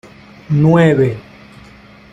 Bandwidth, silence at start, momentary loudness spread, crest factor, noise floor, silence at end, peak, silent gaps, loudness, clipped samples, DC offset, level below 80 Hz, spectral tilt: 8.2 kHz; 0.5 s; 10 LU; 14 dB; -41 dBFS; 0.95 s; -2 dBFS; none; -13 LUFS; under 0.1%; under 0.1%; -48 dBFS; -8.5 dB/octave